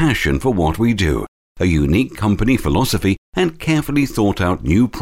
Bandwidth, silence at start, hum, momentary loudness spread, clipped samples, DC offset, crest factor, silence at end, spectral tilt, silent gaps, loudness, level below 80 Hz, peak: 16.5 kHz; 0 s; none; 4 LU; under 0.1%; under 0.1%; 14 dB; 0 s; -6 dB/octave; 1.28-1.55 s, 3.18-3.33 s; -17 LUFS; -28 dBFS; -2 dBFS